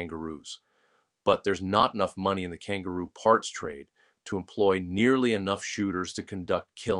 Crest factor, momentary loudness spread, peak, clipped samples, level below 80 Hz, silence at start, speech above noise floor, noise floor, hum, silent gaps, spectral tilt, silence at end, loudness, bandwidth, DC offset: 22 dB; 14 LU; -6 dBFS; under 0.1%; -60 dBFS; 0 s; 42 dB; -70 dBFS; none; none; -5 dB/octave; 0 s; -28 LUFS; 11 kHz; under 0.1%